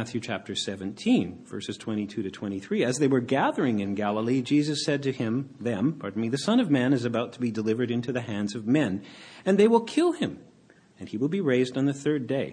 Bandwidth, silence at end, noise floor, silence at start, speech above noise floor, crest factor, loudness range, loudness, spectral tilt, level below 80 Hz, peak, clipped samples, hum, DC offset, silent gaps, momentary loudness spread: 10.5 kHz; 0 s; -57 dBFS; 0 s; 31 dB; 18 dB; 1 LU; -27 LUFS; -6 dB/octave; -68 dBFS; -8 dBFS; under 0.1%; none; under 0.1%; none; 10 LU